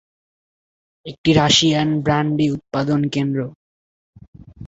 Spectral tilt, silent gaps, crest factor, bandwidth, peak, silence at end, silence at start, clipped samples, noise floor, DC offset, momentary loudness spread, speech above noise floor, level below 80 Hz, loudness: -5 dB/octave; 1.18-1.24 s, 3.55-4.13 s, 4.28-4.33 s; 20 dB; 8 kHz; 0 dBFS; 0 s; 1.05 s; under 0.1%; under -90 dBFS; under 0.1%; 14 LU; over 72 dB; -48 dBFS; -18 LUFS